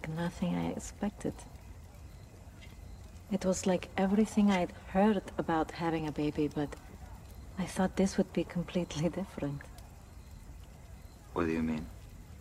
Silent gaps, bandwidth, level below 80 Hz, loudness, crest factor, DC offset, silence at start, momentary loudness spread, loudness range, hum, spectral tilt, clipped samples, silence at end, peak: none; 15 kHz; -52 dBFS; -33 LUFS; 18 dB; under 0.1%; 0 s; 23 LU; 8 LU; none; -6 dB/octave; under 0.1%; 0 s; -16 dBFS